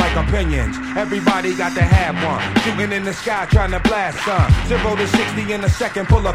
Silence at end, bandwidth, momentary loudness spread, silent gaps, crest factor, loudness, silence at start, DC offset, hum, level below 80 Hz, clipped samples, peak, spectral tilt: 0 s; 14.5 kHz; 6 LU; none; 16 dB; -18 LUFS; 0 s; under 0.1%; none; -24 dBFS; under 0.1%; 0 dBFS; -6 dB/octave